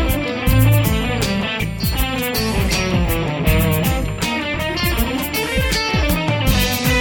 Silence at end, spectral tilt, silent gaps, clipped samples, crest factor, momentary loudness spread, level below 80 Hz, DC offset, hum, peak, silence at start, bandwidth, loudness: 0 s; -5 dB/octave; none; under 0.1%; 16 dB; 5 LU; -24 dBFS; under 0.1%; none; -2 dBFS; 0 s; over 20 kHz; -18 LUFS